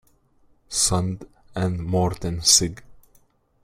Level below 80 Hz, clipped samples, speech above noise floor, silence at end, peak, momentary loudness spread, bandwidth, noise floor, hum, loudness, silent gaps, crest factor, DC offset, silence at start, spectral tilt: -46 dBFS; under 0.1%; 38 dB; 0.7 s; -2 dBFS; 14 LU; 16 kHz; -60 dBFS; none; -21 LUFS; none; 22 dB; under 0.1%; 0.7 s; -3 dB/octave